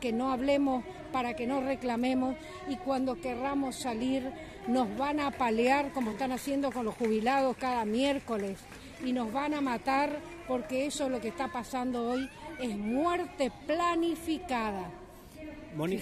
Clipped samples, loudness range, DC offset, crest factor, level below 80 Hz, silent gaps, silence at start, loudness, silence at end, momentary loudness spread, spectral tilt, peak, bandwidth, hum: under 0.1%; 3 LU; under 0.1%; 16 dB; -56 dBFS; none; 0 s; -32 LUFS; 0 s; 11 LU; -5 dB/octave; -14 dBFS; 14.5 kHz; none